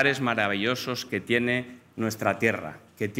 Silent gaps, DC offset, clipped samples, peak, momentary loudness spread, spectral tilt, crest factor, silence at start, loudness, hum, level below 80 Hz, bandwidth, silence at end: none; under 0.1%; under 0.1%; -6 dBFS; 10 LU; -4.5 dB/octave; 20 dB; 0 s; -27 LUFS; none; -70 dBFS; 16 kHz; 0 s